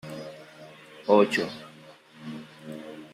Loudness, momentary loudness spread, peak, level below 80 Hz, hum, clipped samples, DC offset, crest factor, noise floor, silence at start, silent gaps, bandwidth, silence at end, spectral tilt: -24 LUFS; 26 LU; -6 dBFS; -74 dBFS; none; under 0.1%; under 0.1%; 24 dB; -51 dBFS; 0.05 s; none; 14.5 kHz; 0.05 s; -5.5 dB/octave